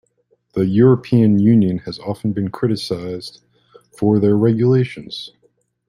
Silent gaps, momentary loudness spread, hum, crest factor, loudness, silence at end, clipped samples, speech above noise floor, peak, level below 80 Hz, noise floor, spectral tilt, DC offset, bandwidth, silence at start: none; 17 LU; none; 16 dB; -17 LUFS; 0.6 s; under 0.1%; 47 dB; -2 dBFS; -54 dBFS; -62 dBFS; -8.5 dB/octave; under 0.1%; 11.5 kHz; 0.55 s